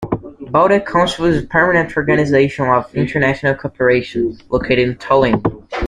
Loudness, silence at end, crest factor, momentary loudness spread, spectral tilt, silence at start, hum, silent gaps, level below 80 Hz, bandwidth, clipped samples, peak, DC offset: -15 LUFS; 0 s; 14 dB; 7 LU; -6.5 dB/octave; 0 s; none; none; -40 dBFS; 11 kHz; under 0.1%; -2 dBFS; under 0.1%